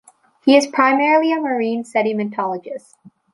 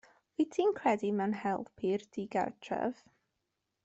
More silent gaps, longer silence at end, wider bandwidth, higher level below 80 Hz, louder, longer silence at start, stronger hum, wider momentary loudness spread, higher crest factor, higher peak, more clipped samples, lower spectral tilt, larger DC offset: neither; second, 0.55 s vs 0.9 s; first, 11.5 kHz vs 8.2 kHz; first, -70 dBFS vs -76 dBFS; first, -17 LUFS vs -34 LUFS; about the same, 0.45 s vs 0.4 s; neither; first, 12 LU vs 7 LU; about the same, 16 dB vs 18 dB; first, -2 dBFS vs -18 dBFS; neither; second, -4.5 dB/octave vs -6.5 dB/octave; neither